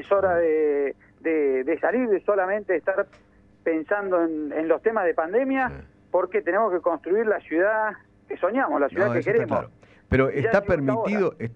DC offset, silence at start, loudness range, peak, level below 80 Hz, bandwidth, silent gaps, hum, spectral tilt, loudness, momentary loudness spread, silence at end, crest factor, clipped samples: under 0.1%; 0 s; 1 LU; -6 dBFS; -50 dBFS; 7 kHz; none; none; -8.5 dB/octave; -24 LUFS; 7 LU; 0 s; 18 dB; under 0.1%